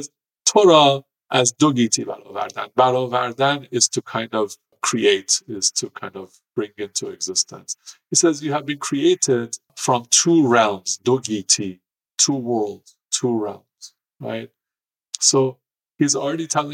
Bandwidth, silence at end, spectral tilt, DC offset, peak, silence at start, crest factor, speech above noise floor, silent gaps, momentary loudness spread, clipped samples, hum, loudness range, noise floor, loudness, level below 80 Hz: 15.5 kHz; 0 s; -3 dB/octave; under 0.1%; -2 dBFS; 0 s; 20 dB; over 70 dB; none; 16 LU; under 0.1%; none; 5 LU; under -90 dBFS; -19 LUFS; -72 dBFS